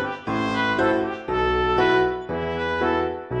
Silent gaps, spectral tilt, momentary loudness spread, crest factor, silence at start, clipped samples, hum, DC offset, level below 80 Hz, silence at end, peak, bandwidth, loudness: none; -6.5 dB/octave; 7 LU; 14 dB; 0 s; under 0.1%; none; under 0.1%; -42 dBFS; 0 s; -8 dBFS; 8.4 kHz; -22 LUFS